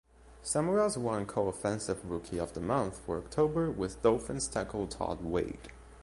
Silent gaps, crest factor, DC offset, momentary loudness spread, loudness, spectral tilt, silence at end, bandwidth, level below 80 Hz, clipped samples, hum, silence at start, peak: none; 20 dB; under 0.1%; 8 LU; -33 LUFS; -5.5 dB/octave; 0 s; 11.5 kHz; -52 dBFS; under 0.1%; none; 0.2 s; -12 dBFS